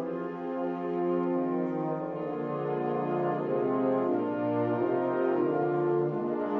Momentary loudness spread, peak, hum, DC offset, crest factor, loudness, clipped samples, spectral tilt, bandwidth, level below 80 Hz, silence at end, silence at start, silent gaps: 6 LU; -16 dBFS; none; under 0.1%; 14 dB; -30 LUFS; under 0.1%; -10.5 dB/octave; 4.5 kHz; -74 dBFS; 0 s; 0 s; none